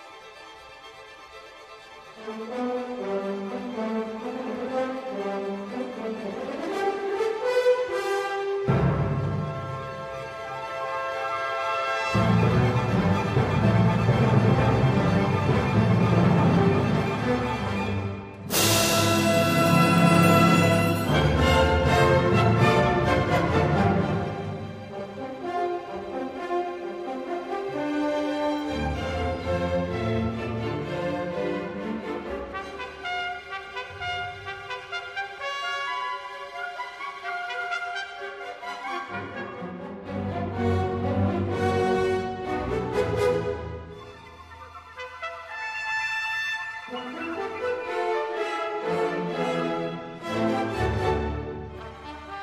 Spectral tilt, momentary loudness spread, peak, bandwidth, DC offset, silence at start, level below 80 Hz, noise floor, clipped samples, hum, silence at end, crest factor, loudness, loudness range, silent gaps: -5.5 dB/octave; 16 LU; -6 dBFS; 15.5 kHz; under 0.1%; 0 s; -42 dBFS; -45 dBFS; under 0.1%; none; 0 s; 20 dB; -25 LUFS; 12 LU; none